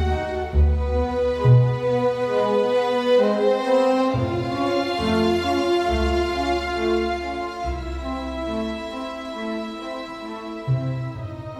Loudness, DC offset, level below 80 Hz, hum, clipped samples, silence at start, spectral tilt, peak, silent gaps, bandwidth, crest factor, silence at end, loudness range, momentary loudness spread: -22 LUFS; under 0.1%; -32 dBFS; none; under 0.1%; 0 s; -7 dB/octave; -6 dBFS; none; 12.5 kHz; 16 dB; 0 s; 9 LU; 12 LU